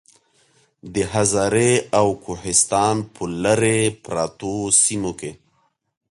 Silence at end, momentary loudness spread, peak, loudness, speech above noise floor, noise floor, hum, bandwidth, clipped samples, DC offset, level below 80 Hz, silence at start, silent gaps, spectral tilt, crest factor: 0.8 s; 13 LU; -2 dBFS; -19 LUFS; 46 dB; -65 dBFS; none; 11.5 kHz; under 0.1%; under 0.1%; -50 dBFS; 0.85 s; none; -3.5 dB/octave; 20 dB